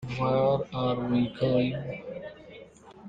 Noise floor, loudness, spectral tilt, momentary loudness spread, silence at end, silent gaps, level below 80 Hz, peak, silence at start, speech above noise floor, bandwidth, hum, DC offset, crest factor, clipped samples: -49 dBFS; -28 LUFS; -8.5 dB/octave; 20 LU; 0 s; none; -56 dBFS; -12 dBFS; 0 s; 23 dB; 7.6 kHz; none; under 0.1%; 16 dB; under 0.1%